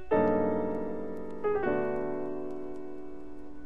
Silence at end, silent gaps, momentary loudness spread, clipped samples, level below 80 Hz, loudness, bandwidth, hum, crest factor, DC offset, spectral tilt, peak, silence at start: 0 s; none; 17 LU; under 0.1%; -54 dBFS; -32 LUFS; 5.2 kHz; none; 16 dB; 1%; -9 dB/octave; -14 dBFS; 0 s